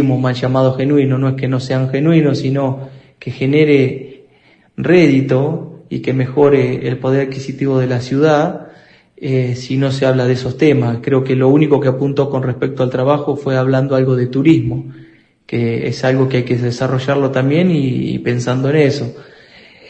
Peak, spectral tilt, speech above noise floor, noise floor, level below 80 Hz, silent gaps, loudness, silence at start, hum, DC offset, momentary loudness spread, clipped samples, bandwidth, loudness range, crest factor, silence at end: 0 dBFS; -8 dB/octave; 37 dB; -50 dBFS; -50 dBFS; none; -15 LUFS; 0 s; none; under 0.1%; 10 LU; under 0.1%; 8.4 kHz; 2 LU; 14 dB; 0.65 s